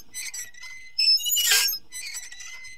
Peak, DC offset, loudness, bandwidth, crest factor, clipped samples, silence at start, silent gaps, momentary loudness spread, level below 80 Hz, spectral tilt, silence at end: -6 dBFS; 0.7%; -20 LUFS; 16 kHz; 20 dB; under 0.1%; 0.15 s; none; 20 LU; -64 dBFS; 4.5 dB/octave; 0 s